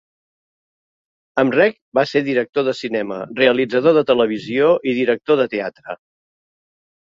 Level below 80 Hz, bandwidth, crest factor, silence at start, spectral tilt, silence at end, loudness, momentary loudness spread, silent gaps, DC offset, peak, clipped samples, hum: -62 dBFS; 7.6 kHz; 18 dB; 1.35 s; -6.5 dB/octave; 1.05 s; -17 LUFS; 10 LU; 1.81-1.92 s, 2.49-2.53 s; under 0.1%; 0 dBFS; under 0.1%; none